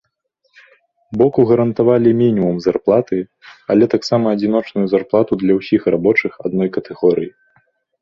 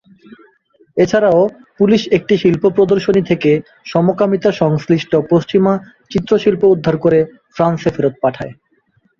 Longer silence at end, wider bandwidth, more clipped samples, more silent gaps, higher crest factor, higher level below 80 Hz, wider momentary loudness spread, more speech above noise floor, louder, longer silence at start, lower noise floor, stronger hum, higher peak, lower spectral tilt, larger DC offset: about the same, 0.7 s vs 0.7 s; about the same, 7.2 kHz vs 7.2 kHz; neither; neither; about the same, 14 dB vs 14 dB; about the same, -54 dBFS vs -50 dBFS; about the same, 8 LU vs 7 LU; first, 52 dB vs 45 dB; about the same, -16 LUFS vs -14 LUFS; first, 1.1 s vs 0.3 s; first, -67 dBFS vs -58 dBFS; neither; about the same, -2 dBFS vs 0 dBFS; about the same, -8 dB/octave vs -7.5 dB/octave; neither